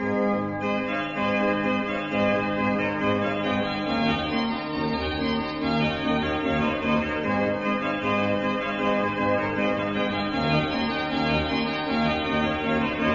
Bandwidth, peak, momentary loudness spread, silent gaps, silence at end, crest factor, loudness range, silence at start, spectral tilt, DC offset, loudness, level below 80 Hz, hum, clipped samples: 7.2 kHz; -10 dBFS; 3 LU; none; 0 s; 14 dB; 1 LU; 0 s; -7 dB/octave; under 0.1%; -25 LUFS; -46 dBFS; none; under 0.1%